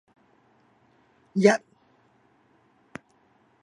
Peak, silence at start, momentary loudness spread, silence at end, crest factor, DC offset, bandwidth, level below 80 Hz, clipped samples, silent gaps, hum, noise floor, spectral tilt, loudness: -4 dBFS; 1.35 s; 25 LU; 2.05 s; 26 dB; under 0.1%; 11 kHz; -78 dBFS; under 0.1%; none; none; -64 dBFS; -5.5 dB/octave; -23 LUFS